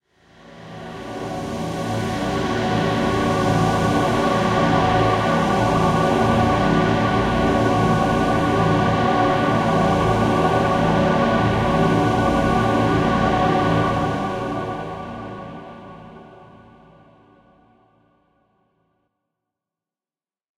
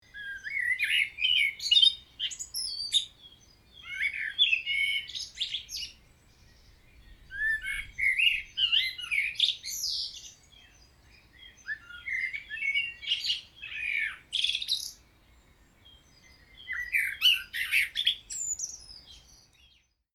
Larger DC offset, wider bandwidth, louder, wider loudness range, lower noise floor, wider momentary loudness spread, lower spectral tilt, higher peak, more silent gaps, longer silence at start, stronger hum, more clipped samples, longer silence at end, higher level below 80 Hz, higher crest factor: neither; second, 14 kHz vs 19.5 kHz; first, -19 LUFS vs -27 LUFS; about the same, 7 LU vs 7 LU; first, under -90 dBFS vs -65 dBFS; second, 13 LU vs 16 LU; first, -6.5 dB/octave vs 3 dB/octave; first, -4 dBFS vs -10 dBFS; neither; first, 0.5 s vs 0.15 s; neither; neither; first, 4.1 s vs 0.8 s; first, -38 dBFS vs -60 dBFS; second, 16 dB vs 22 dB